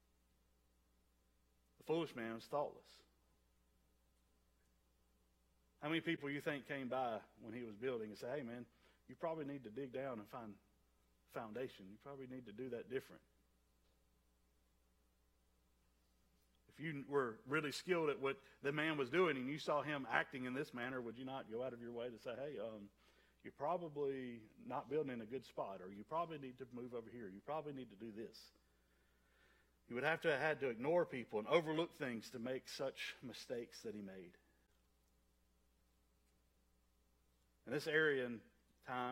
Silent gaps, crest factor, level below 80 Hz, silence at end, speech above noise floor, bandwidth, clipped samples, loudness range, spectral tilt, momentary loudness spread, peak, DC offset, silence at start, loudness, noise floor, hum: none; 26 dB; -80 dBFS; 0 s; 34 dB; 16 kHz; under 0.1%; 12 LU; -5.5 dB/octave; 16 LU; -20 dBFS; under 0.1%; 1.85 s; -44 LUFS; -78 dBFS; none